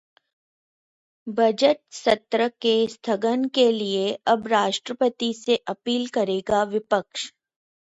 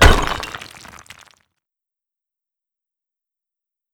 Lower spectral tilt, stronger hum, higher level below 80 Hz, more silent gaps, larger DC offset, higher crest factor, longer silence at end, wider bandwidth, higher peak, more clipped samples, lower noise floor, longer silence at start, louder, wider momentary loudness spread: about the same, -4 dB/octave vs -4 dB/octave; neither; second, -64 dBFS vs -24 dBFS; neither; neither; about the same, 20 dB vs 22 dB; second, 0.55 s vs 3.35 s; second, 8 kHz vs 18 kHz; second, -4 dBFS vs 0 dBFS; neither; about the same, under -90 dBFS vs -87 dBFS; first, 1.25 s vs 0 s; second, -23 LUFS vs -19 LUFS; second, 6 LU vs 26 LU